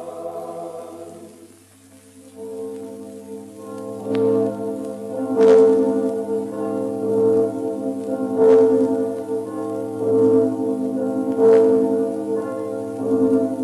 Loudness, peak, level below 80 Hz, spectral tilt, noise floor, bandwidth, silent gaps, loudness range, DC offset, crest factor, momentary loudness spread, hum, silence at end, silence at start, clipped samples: -19 LUFS; -2 dBFS; -70 dBFS; -7.5 dB/octave; -48 dBFS; 12 kHz; none; 16 LU; under 0.1%; 16 dB; 20 LU; none; 0 s; 0 s; under 0.1%